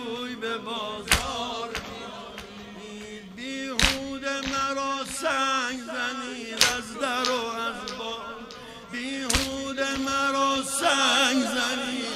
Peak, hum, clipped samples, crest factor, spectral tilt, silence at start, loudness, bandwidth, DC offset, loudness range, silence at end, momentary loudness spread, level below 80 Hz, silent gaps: 0 dBFS; none; under 0.1%; 28 dB; -2 dB/octave; 0 s; -26 LUFS; 16 kHz; under 0.1%; 6 LU; 0 s; 17 LU; -46 dBFS; none